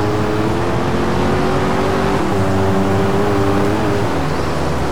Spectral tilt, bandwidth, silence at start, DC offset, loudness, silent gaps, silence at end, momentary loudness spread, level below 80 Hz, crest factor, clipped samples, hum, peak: -6.5 dB/octave; 18.5 kHz; 0 s; 7%; -17 LUFS; none; 0 s; 3 LU; -30 dBFS; 10 dB; under 0.1%; none; -4 dBFS